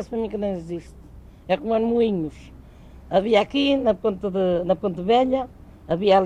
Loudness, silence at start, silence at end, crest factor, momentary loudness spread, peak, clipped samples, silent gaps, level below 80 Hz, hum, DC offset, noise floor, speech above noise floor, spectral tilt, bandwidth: -22 LUFS; 0 s; 0 s; 16 dB; 12 LU; -6 dBFS; under 0.1%; none; -46 dBFS; none; under 0.1%; -44 dBFS; 23 dB; -7 dB/octave; 9.6 kHz